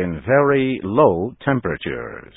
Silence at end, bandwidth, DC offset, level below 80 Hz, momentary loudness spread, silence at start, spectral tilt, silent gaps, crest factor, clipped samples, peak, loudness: 0.15 s; 4 kHz; under 0.1%; -44 dBFS; 11 LU; 0 s; -12 dB/octave; none; 18 dB; under 0.1%; 0 dBFS; -19 LUFS